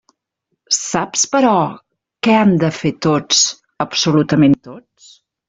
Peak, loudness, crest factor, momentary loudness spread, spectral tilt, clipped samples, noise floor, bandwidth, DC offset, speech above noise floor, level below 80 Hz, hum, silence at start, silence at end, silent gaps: 0 dBFS; -15 LUFS; 16 dB; 8 LU; -4 dB/octave; under 0.1%; -73 dBFS; 8.2 kHz; under 0.1%; 58 dB; -54 dBFS; none; 0.7 s; 0.7 s; none